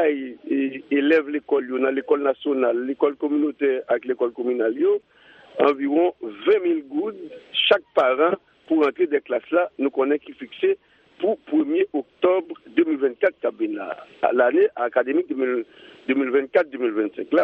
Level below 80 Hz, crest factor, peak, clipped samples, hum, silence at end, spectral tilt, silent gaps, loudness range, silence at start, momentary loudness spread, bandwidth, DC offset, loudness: -74 dBFS; 18 dB; -4 dBFS; under 0.1%; none; 0 s; -6.5 dB/octave; none; 2 LU; 0 s; 8 LU; 5.2 kHz; under 0.1%; -22 LUFS